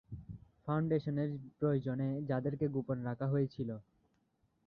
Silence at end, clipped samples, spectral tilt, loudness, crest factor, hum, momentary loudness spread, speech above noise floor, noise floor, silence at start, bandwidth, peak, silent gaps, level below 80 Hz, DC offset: 0.85 s; under 0.1%; -9 dB/octave; -36 LUFS; 16 dB; none; 14 LU; 42 dB; -77 dBFS; 0.1 s; 5.2 kHz; -22 dBFS; none; -66 dBFS; under 0.1%